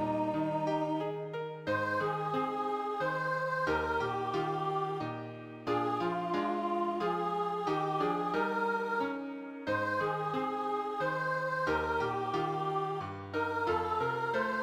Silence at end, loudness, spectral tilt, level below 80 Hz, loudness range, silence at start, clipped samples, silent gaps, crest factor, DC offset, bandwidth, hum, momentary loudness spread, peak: 0 s; -33 LUFS; -6.5 dB/octave; -62 dBFS; 1 LU; 0 s; under 0.1%; none; 14 dB; under 0.1%; 15.5 kHz; none; 5 LU; -18 dBFS